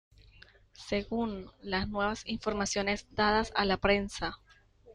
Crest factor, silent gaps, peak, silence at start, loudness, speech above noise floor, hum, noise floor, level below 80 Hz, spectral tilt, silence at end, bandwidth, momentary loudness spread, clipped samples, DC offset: 20 dB; none; -12 dBFS; 0.8 s; -31 LUFS; 27 dB; none; -58 dBFS; -50 dBFS; -4 dB/octave; 0 s; 11 kHz; 10 LU; under 0.1%; under 0.1%